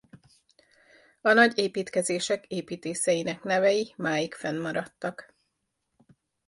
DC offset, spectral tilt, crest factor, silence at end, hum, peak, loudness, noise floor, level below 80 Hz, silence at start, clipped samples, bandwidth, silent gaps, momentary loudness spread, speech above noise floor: under 0.1%; -3.5 dB/octave; 22 dB; 1.25 s; none; -6 dBFS; -27 LUFS; -79 dBFS; -72 dBFS; 0.15 s; under 0.1%; 11.5 kHz; none; 14 LU; 53 dB